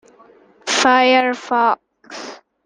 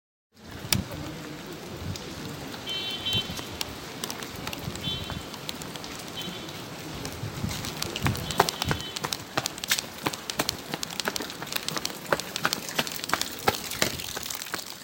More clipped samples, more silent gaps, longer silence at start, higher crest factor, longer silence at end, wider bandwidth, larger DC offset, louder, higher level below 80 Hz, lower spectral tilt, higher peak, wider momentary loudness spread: neither; neither; first, 0.65 s vs 0.35 s; second, 16 dB vs 32 dB; first, 0.3 s vs 0 s; second, 10 kHz vs 17 kHz; neither; first, -15 LUFS vs -30 LUFS; second, -66 dBFS vs -50 dBFS; second, -1 dB/octave vs -2.5 dB/octave; about the same, -2 dBFS vs 0 dBFS; first, 21 LU vs 10 LU